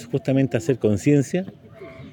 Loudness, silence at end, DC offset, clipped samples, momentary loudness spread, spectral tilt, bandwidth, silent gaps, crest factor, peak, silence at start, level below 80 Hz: -21 LUFS; 0 s; under 0.1%; under 0.1%; 19 LU; -7.5 dB/octave; 17 kHz; none; 16 dB; -6 dBFS; 0 s; -60 dBFS